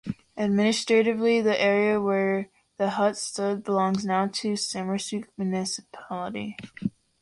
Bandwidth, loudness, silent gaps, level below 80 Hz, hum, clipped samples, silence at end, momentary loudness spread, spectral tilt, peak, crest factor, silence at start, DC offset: 11.5 kHz; -26 LUFS; none; -64 dBFS; none; under 0.1%; 0.3 s; 12 LU; -4.5 dB/octave; -10 dBFS; 16 dB; 0.05 s; under 0.1%